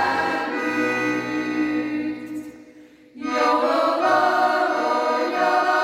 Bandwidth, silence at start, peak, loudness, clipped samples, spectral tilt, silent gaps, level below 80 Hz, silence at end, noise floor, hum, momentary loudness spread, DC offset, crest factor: 15.5 kHz; 0 s; -6 dBFS; -21 LUFS; under 0.1%; -4 dB/octave; none; -66 dBFS; 0 s; -48 dBFS; none; 11 LU; under 0.1%; 14 dB